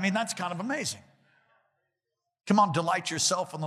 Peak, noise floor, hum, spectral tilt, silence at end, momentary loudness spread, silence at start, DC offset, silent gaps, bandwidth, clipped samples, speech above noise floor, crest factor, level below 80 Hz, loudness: -10 dBFS; -85 dBFS; none; -3.5 dB/octave; 0 s; 11 LU; 0 s; under 0.1%; none; 15 kHz; under 0.1%; 57 dB; 20 dB; -78 dBFS; -27 LUFS